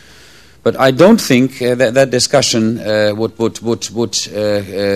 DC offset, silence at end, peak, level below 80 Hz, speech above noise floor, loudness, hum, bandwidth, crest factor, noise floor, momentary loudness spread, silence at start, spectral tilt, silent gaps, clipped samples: 0.5%; 0 s; 0 dBFS; -48 dBFS; 30 dB; -13 LUFS; none; 14.5 kHz; 14 dB; -42 dBFS; 9 LU; 0.65 s; -4.5 dB/octave; none; 0.3%